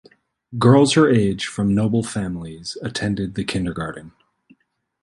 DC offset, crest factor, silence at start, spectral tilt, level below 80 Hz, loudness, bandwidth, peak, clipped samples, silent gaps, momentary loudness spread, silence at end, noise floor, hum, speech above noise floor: under 0.1%; 18 dB; 0.5 s; -6 dB/octave; -46 dBFS; -19 LUFS; 11.5 kHz; -2 dBFS; under 0.1%; none; 16 LU; 0.95 s; -64 dBFS; none; 45 dB